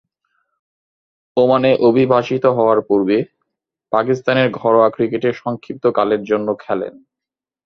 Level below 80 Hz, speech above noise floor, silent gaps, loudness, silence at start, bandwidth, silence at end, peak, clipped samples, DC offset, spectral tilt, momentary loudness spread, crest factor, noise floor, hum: -60 dBFS; 71 dB; none; -16 LUFS; 1.35 s; 6.4 kHz; 0.75 s; 0 dBFS; under 0.1%; under 0.1%; -7.5 dB/octave; 10 LU; 16 dB; -87 dBFS; none